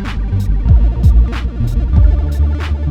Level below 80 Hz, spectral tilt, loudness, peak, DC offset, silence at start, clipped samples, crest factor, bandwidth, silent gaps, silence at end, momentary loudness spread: -12 dBFS; -8 dB/octave; -14 LUFS; 0 dBFS; under 0.1%; 0 s; under 0.1%; 12 dB; 5.6 kHz; none; 0 s; 6 LU